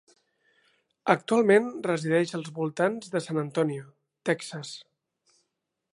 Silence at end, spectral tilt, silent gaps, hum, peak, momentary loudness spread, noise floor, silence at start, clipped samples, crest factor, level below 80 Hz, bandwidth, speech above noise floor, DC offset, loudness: 1.1 s; -5.5 dB/octave; none; none; -4 dBFS; 15 LU; -82 dBFS; 1.05 s; under 0.1%; 26 dB; -78 dBFS; 11.5 kHz; 56 dB; under 0.1%; -27 LUFS